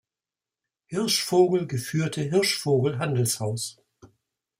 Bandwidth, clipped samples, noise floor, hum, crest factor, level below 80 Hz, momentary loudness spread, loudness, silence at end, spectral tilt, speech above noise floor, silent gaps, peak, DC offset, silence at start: 16 kHz; under 0.1%; under -90 dBFS; none; 20 dB; -66 dBFS; 9 LU; -25 LUFS; 0.55 s; -4.5 dB/octave; over 66 dB; none; -8 dBFS; under 0.1%; 0.9 s